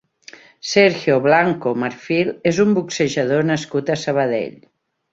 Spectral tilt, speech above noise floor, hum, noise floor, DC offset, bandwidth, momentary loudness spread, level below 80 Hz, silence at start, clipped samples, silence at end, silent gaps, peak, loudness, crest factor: -5 dB/octave; 27 dB; none; -45 dBFS; under 0.1%; 8 kHz; 7 LU; -60 dBFS; 0.65 s; under 0.1%; 0.65 s; none; -2 dBFS; -18 LUFS; 18 dB